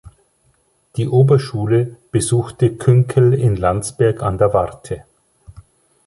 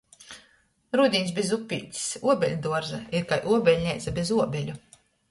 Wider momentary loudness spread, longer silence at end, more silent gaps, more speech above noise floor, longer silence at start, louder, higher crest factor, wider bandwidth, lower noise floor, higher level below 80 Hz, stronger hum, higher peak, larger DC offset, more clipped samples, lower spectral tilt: second, 11 LU vs 18 LU; about the same, 0.45 s vs 0.5 s; neither; first, 45 dB vs 38 dB; first, 0.95 s vs 0.2 s; first, -16 LUFS vs -26 LUFS; about the same, 14 dB vs 18 dB; about the same, 11.5 kHz vs 11.5 kHz; about the same, -60 dBFS vs -63 dBFS; first, -40 dBFS vs -54 dBFS; neither; first, -2 dBFS vs -8 dBFS; neither; neither; first, -7 dB/octave vs -4.5 dB/octave